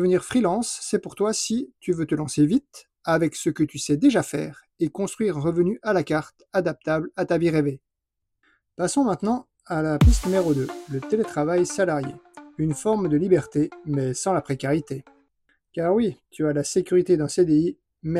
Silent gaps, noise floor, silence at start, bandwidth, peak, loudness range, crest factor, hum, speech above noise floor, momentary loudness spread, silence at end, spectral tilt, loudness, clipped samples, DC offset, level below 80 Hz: none; -81 dBFS; 0 s; 14.5 kHz; -6 dBFS; 2 LU; 18 dB; none; 59 dB; 9 LU; 0 s; -6 dB/octave; -23 LUFS; under 0.1%; under 0.1%; -36 dBFS